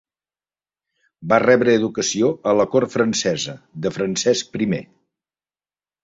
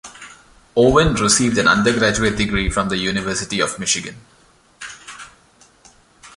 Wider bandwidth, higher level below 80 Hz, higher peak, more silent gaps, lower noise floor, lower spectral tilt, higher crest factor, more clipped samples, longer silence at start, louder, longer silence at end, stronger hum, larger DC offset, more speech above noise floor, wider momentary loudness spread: second, 8 kHz vs 11.5 kHz; second, -60 dBFS vs -36 dBFS; about the same, -2 dBFS vs -2 dBFS; neither; first, under -90 dBFS vs -52 dBFS; about the same, -4 dB/octave vs -3.5 dB/octave; about the same, 20 dB vs 18 dB; neither; first, 1.2 s vs 0.05 s; about the same, -19 LUFS vs -17 LUFS; first, 1.2 s vs 0.1 s; first, 50 Hz at -50 dBFS vs none; neither; first, over 71 dB vs 35 dB; second, 12 LU vs 22 LU